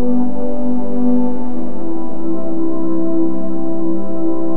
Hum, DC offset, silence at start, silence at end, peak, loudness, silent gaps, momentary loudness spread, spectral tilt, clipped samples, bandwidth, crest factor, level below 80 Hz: none; 40%; 0 s; 0 s; -2 dBFS; -21 LUFS; none; 7 LU; -11.5 dB/octave; under 0.1%; 3.2 kHz; 12 dB; -46 dBFS